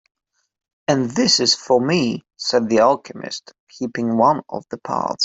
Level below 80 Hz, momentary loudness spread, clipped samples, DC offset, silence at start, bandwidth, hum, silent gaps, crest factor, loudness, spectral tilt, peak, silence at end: -60 dBFS; 15 LU; under 0.1%; under 0.1%; 0.9 s; 8.4 kHz; none; 3.60-3.67 s; 18 dB; -18 LUFS; -4 dB/octave; -2 dBFS; 0 s